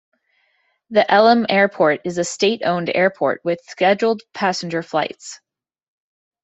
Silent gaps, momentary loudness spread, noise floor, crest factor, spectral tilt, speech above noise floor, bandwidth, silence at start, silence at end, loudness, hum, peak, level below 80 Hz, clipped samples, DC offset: none; 10 LU; -65 dBFS; 18 dB; -4.5 dB/octave; 47 dB; 8.2 kHz; 0.9 s; 1.1 s; -18 LUFS; none; -2 dBFS; -66 dBFS; under 0.1%; under 0.1%